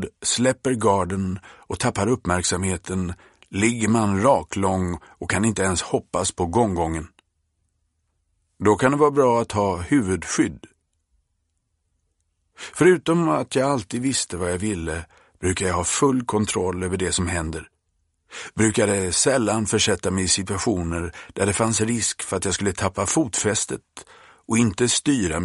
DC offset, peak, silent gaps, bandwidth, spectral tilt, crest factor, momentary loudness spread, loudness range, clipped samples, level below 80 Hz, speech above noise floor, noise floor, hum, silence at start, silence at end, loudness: under 0.1%; -2 dBFS; none; 11.5 kHz; -4 dB/octave; 20 dB; 10 LU; 3 LU; under 0.1%; -46 dBFS; 51 dB; -73 dBFS; none; 0 s; 0 s; -22 LUFS